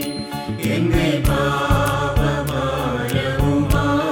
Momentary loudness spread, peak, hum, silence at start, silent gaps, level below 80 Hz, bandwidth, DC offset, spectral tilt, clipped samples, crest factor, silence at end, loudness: 5 LU; -2 dBFS; none; 0 s; none; -28 dBFS; 19 kHz; under 0.1%; -6 dB/octave; under 0.1%; 16 dB; 0 s; -19 LUFS